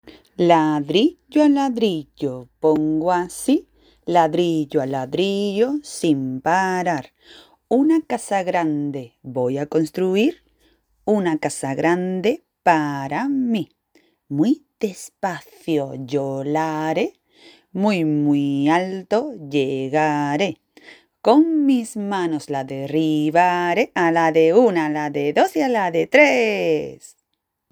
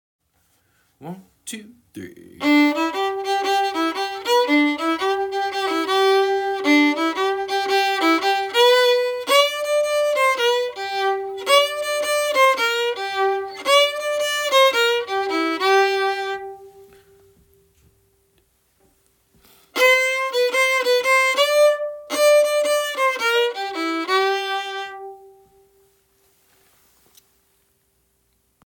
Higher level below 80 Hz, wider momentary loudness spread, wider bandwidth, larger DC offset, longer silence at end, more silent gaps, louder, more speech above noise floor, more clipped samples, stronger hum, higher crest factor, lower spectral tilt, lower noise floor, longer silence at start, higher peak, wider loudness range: about the same, -64 dBFS vs -68 dBFS; about the same, 10 LU vs 10 LU; about the same, over 20 kHz vs 18.5 kHz; neither; second, 0.75 s vs 3.5 s; neither; about the same, -20 LUFS vs -19 LUFS; first, 57 dB vs 43 dB; neither; neither; about the same, 20 dB vs 18 dB; first, -5.5 dB/octave vs -1.5 dB/octave; first, -76 dBFS vs -66 dBFS; second, 0.05 s vs 1 s; first, 0 dBFS vs -4 dBFS; about the same, 6 LU vs 7 LU